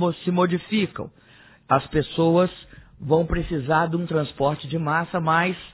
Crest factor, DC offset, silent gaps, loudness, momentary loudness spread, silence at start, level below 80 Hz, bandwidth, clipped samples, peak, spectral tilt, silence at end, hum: 18 dB; under 0.1%; none; -23 LUFS; 7 LU; 0 s; -42 dBFS; 4 kHz; under 0.1%; -4 dBFS; -11 dB/octave; 0.05 s; none